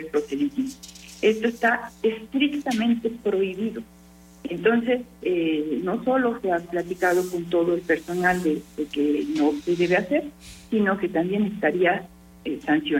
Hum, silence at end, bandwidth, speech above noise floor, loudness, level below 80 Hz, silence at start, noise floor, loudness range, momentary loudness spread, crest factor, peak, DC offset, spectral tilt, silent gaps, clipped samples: none; 0 s; 16.5 kHz; 26 dB; -24 LUFS; -56 dBFS; 0 s; -49 dBFS; 2 LU; 9 LU; 16 dB; -8 dBFS; under 0.1%; -5.5 dB/octave; none; under 0.1%